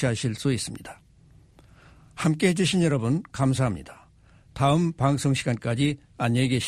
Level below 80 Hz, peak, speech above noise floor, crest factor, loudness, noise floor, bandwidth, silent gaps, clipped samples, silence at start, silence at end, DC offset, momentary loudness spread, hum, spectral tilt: -52 dBFS; -8 dBFS; 31 dB; 18 dB; -25 LUFS; -55 dBFS; 13.5 kHz; none; under 0.1%; 0 s; 0 s; under 0.1%; 12 LU; none; -5.5 dB/octave